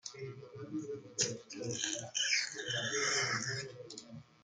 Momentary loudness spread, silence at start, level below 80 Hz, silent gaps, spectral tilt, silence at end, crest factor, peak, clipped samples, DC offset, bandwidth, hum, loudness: 17 LU; 0.05 s; -78 dBFS; none; -1.5 dB/octave; 0.2 s; 22 dB; -16 dBFS; under 0.1%; under 0.1%; 11 kHz; none; -35 LUFS